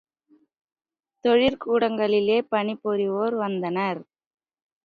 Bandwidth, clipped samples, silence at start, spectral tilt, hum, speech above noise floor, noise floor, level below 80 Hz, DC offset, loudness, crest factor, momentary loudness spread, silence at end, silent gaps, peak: 5 kHz; under 0.1%; 1.25 s; -7.5 dB/octave; none; 40 dB; -62 dBFS; -62 dBFS; under 0.1%; -23 LUFS; 16 dB; 7 LU; 0.85 s; none; -8 dBFS